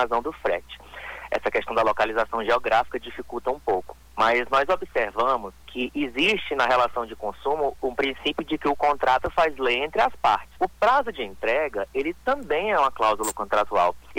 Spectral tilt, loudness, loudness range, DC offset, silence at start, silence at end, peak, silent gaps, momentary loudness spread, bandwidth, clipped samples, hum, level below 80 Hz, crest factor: -3.5 dB/octave; -24 LUFS; 2 LU; under 0.1%; 0 s; 0 s; -8 dBFS; none; 9 LU; 19 kHz; under 0.1%; none; -50 dBFS; 16 dB